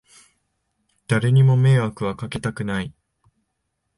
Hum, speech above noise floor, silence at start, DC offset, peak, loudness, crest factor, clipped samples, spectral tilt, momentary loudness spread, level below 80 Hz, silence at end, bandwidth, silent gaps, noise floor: none; 57 dB; 1.1 s; under 0.1%; -6 dBFS; -20 LUFS; 16 dB; under 0.1%; -7.5 dB/octave; 12 LU; -52 dBFS; 1.05 s; 11.5 kHz; none; -75 dBFS